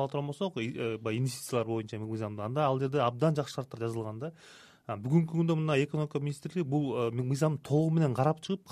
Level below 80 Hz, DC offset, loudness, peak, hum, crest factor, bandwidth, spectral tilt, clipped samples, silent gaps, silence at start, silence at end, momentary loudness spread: -70 dBFS; under 0.1%; -31 LUFS; -14 dBFS; none; 18 dB; 14 kHz; -7 dB/octave; under 0.1%; none; 0 s; 0 s; 9 LU